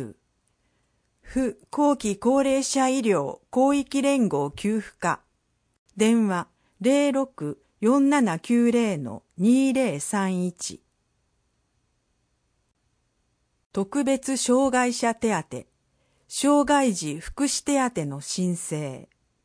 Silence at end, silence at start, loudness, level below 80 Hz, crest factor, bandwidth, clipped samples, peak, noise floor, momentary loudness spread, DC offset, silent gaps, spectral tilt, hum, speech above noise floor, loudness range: 0.45 s; 0 s; -24 LUFS; -56 dBFS; 16 dB; 10.5 kHz; under 0.1%; -8 dBFS; -71 dBFS; 12 LU; under 0.1%; 5.78-5.86 s, 13.66-13.70 s; -4.5 dB/octave; none; 48 dB; 8 LU